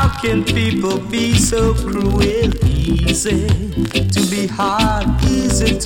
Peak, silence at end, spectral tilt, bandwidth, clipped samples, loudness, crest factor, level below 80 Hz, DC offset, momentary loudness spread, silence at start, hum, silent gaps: -2 dBFS; 0 s; -5 dB/octave; 17 kHz; under 0.1%; -16 LUFS; 12 dB; -22 dBFS; under 0.1%; 4 LU; 0 s; none; none